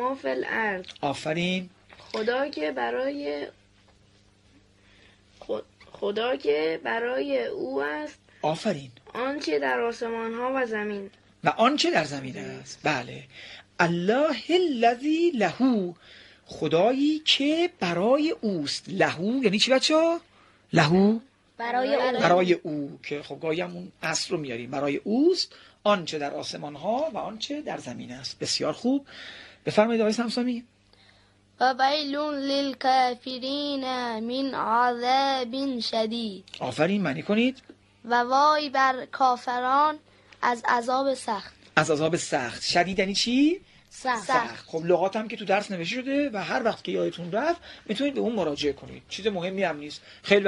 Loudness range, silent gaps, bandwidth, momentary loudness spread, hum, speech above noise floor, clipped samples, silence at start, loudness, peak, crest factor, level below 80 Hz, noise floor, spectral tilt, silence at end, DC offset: 6 LU; none; 11.5 kHz; 13 LU; none; 34 dB; under 0.1%; 0 s; -26 LUFS; -2 dBFS; 24 dB; -64 dBFS; -59 dBFS; -4.5 dB/octave; 0 s; under 0.1%